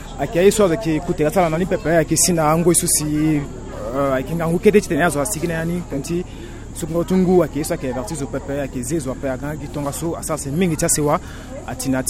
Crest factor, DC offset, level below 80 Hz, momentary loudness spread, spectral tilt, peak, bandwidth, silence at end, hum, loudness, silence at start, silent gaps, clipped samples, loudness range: 18 dB; under 0.1%; -36 dBFS; 11 LU; -5 dB/octave; 0 dBFS; 16.5 kHz; 0 s; none; -19 LUFS; 0 s; none; under 0.1%; 5 LU